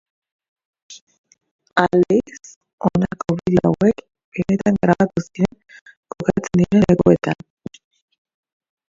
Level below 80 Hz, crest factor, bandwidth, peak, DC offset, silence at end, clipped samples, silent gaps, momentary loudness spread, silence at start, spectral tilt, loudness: -46 dBFS; 20 dB; 7.6 kHz; 0 dBFS; under 0.1%; 1.55 s; under 0.1%; 1.02-1.07 s, 1.18-1.24 s, 1.51-1.59 s, 2.56-2.61 s, 2.73-2.78 s, 4.24-4.32 s, 5.81-5.86 s, 5.97-6.03 s; 16 LU; 0.9 s; -7.5 dB/octave; -18 LUFS